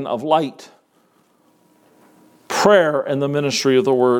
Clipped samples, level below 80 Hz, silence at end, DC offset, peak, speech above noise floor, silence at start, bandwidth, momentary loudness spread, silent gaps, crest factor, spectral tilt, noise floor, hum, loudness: under 0.1%; -66 dBFS; 0 s; under 0.1%; 0 dBFS; 42 dB; 0 s; 18 kHz; 7 LU; none; 20 dB; -4.5 dB/octave; -59 dBFS; none; -17 LUFS